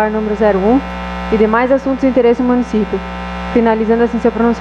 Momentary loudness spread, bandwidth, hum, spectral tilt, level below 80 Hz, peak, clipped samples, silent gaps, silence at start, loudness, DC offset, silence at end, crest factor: 9 LU; 8 kHz; none; -7.5 dB/octave; -32 dBFS; 0 dBFS; under 0.1%; none; 0 s; -14 LUFS; under 0.1%; 0 s; 12 dB